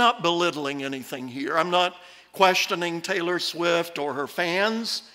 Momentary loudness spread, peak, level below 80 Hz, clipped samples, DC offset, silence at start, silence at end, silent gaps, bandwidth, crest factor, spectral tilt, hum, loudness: 11 LU; -6 dBFS; -72 dBFS; under 0.1%; under 0.1%; 0 s; 0.05 s; none; 16 kHz; 20 dB; -3 dB/octave; none; -24 LUFS